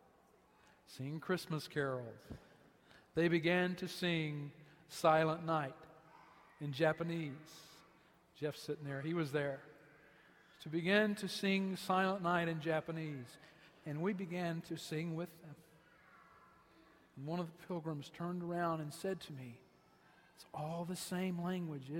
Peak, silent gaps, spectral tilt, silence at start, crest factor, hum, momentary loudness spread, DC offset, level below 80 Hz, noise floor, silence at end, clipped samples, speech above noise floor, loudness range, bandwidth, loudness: -18 dBFS; none; -6 dB/octave; 0.9 s; 22 dB; none; 19 LU; under 0.1%; -76 dBFS; -69 dBFS; 0 s; under 0.1%; 30 dB; 8 LU; 16 kHz; -39 LUFS